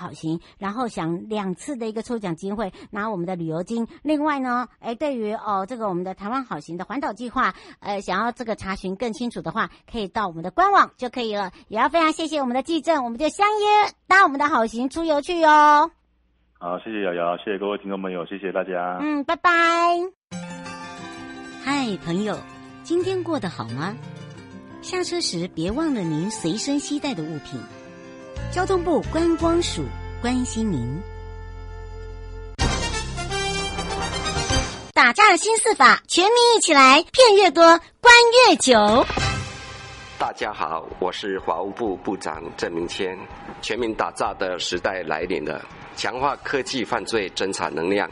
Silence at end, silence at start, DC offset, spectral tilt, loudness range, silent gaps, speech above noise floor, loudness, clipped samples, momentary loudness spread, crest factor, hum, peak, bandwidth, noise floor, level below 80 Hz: 0 s; 0 s; under 0.1%; -3.5 dB/octave; 13 LU; 20.16-20.28 s; 43 dB; -21 LUFS; under 0.1%; 20 LU; 20 dB; none; -2 dBFS; 11.5 kHz; -64 dBFS; -42 dBFS